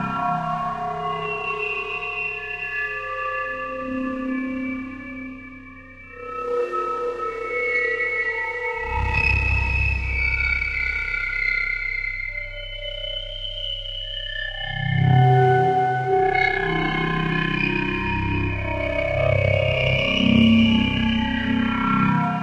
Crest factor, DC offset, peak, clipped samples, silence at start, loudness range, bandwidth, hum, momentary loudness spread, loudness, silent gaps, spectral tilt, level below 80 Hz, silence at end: 18 dB; under 0.1%; -4 dBFS; under 0.1%; 0 s; 8 LU; 8.2 kHz; none; 11 LU; -22 LUFS; none; -7 dB/octave; -34 dBFS; 0 s